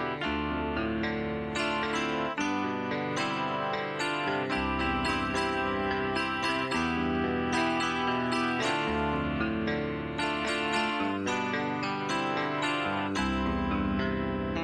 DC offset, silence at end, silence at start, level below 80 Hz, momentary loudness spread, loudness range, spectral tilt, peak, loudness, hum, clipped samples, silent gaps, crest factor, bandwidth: under 0.1%; 0 s; 0 s; -46 dBFS; 3 LU; 2 LU; -5 dB/octave; -14 dBFS; -30 LUFS; none; under 0.1%; none; 14 dB; 11.5 kHz